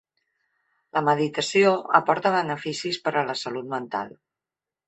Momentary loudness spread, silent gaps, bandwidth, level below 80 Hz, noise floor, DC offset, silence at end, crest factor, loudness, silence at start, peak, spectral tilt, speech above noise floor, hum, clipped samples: 11 LU; none; 8.4 kHz; -70 dBFS; -90 dBFS; under 0.1%; 0.8 s; 22 dB; -24 LUFS; 0.95 s; -2 dBFS; -4.5 dB/octave; 66 dB; none; under 0.1%